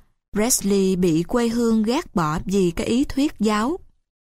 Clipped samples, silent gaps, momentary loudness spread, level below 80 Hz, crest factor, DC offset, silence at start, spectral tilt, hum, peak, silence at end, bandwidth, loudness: under 0.1%; none; 5 LU; -40 dBFS; 16 dB; under 0.1%; 0.35 s; -5 dB/octave; none; -6 dBFS; 0.55 s; 16 kHz; -21 LUFS